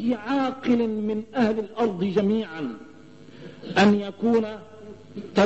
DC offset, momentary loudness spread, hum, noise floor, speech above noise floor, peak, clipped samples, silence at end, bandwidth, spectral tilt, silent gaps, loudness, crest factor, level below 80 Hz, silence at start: 0.2%; 21 LU; none; -47 dBFS; 24 dB; -6 dBFS; under 0.1%; 0 s; 8.2 kHz; -6.5 dB/octave; none; -24 LUFS; 18 dB; -60 dBFS; 0 s